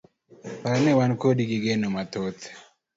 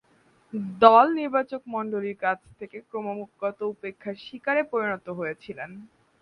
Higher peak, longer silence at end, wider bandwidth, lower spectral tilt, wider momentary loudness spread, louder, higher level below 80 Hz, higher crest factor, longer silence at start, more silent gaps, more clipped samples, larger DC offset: second, -8 dBFS vs 0 dBFS; about the same, 0.35 s vs 0.35 s; first, 7.8 kHz vs 5.6 kHz; about the same, -6.5 dB/octave vs -7.5 dB/octave; about the same, 20 LU vs 19 LU; about the same, -24 LUFS vs -25 LUFS; first, -62 dBFS vs -68 dBFS; second, 16 dB vs 26 dB; about the same, 0.45 s vs 0.55 s; neither; neither; neither